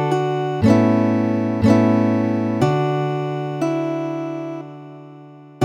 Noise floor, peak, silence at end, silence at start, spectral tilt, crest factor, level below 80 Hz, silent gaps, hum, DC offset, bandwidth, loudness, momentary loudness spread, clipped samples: -41 dBFS; -2 dBFS; 0 s; 0 s; -8 dB/octave; 16 dB; -52 dBFS; none; none; under 0.1%; 9.6 kHz; -19 LUFS; 15 LU; under 0.1%